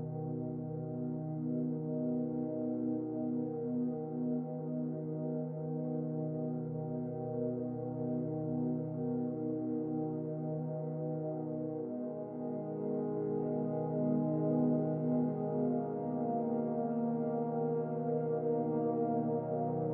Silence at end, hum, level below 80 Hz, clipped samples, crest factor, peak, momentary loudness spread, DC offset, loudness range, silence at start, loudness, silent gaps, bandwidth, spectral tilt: 0 s; none; -76 dBFS; under 0.1%; 16 dB; -20 dBFS; 6 LU; under 0.1%; 4 LU; 0 s; -36 LUFS; none; 2.2 kHz; -13.5 dB/octave